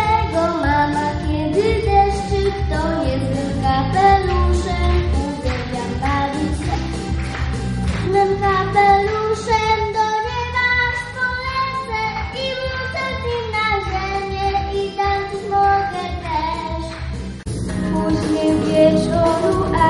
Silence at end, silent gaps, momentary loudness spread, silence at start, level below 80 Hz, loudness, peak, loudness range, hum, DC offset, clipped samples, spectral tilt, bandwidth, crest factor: 0 s; none; 9 LU; 0 s; -28 dBFS; -19 LUFS; -2 dBFS; 4 LU; none; under 0.1%; under 0.1%; -6 dB/octave; 11.5 kHz; 16 dB